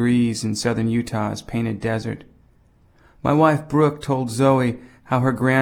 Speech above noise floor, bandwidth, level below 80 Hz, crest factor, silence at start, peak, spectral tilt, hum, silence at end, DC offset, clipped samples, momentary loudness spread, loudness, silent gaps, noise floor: 36 dB; 16 kHz; -50 dBFS; 18 dB; 0 s; -2 dBFS; -6.5 dB/octave; none; 0 s; under 0.1%; under 0.1%; 9 LU; -21 LUFS; none; -55 dBFS